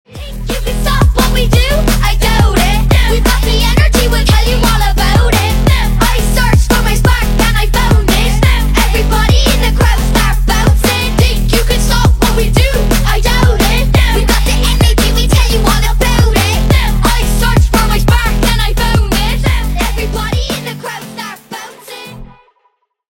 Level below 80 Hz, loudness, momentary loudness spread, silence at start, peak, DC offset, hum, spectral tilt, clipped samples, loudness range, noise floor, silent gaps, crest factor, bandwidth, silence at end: -12 dBFS; -11 LUFS; 7 LU; 0.1 s; 0 dBFS; under 0.1%; none; -4.5 dB/octave; under 0.1%; 3 LU; -59 dBFS; none; 10 dB; 17 kHz; 0.85 s